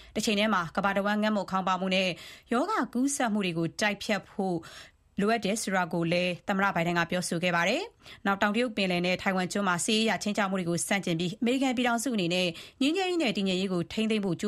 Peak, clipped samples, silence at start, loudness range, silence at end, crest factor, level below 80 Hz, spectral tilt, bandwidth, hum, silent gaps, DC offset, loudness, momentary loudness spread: -8 dBFS; under 0.1%; 0 s; 2 LU; 0 s; 20 dB; -62 dBFS; -4.5 dB/octave; 15 kHz; none; none; under 0.1%; -28 LUFS; 5 LU